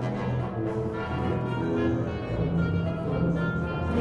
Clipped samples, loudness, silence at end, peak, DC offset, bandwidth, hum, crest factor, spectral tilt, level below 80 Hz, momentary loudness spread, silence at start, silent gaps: under 0.1%; -28 LUFS; 0 s; -14 dBFS; under 0.1%; 7.2 kHz; none; 14 dB; -9 dB/octave; -42 dBFS; 3 LU; 0 s; none